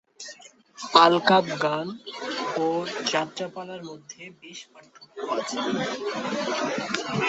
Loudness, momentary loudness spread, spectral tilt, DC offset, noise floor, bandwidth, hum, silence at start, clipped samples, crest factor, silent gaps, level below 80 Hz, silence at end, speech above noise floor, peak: -24 LUFS; 23 LU; -4 dB/octave; under 0.1%; -48 dBFS; 8.2 kHz; none; 0.2 s; under 0.1%; 26 dB; none; -70 dBFS; 0 s; 22 dB; 0 dBFS